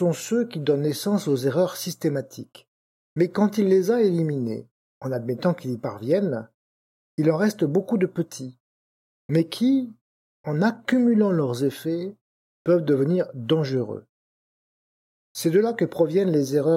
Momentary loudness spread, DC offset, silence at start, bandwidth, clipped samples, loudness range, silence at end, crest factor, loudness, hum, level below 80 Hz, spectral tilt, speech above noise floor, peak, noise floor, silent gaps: 13 LU; under 0.1%; 0 s; 16.5 kHz; under 0.1%; 3 LU; 0 s; 16 dB; -23 LUFS; none; -74 dBFS; -6.5 dB/octave; over 68 dB; -8 dBFS; under -90 dBFS; 2.68-3.16 s, 4.71-5.01 s, 6.54-7.18 s, 8.60-9.29 s, 10.01-10.44 s, 12.21-12.65 s, 14.09-15.35 s